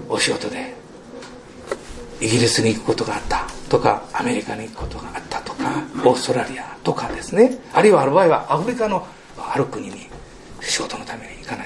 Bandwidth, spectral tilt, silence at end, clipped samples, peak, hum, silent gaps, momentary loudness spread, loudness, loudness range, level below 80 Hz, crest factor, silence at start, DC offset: 12 kHz; -4.5 dB/octave; 0 s; under 0.1%; 0 dBFS; none; none; 21 LU; -20 LUFS; 5 LU; -42 dBFS; 20 dB; 0 s; under 0.1%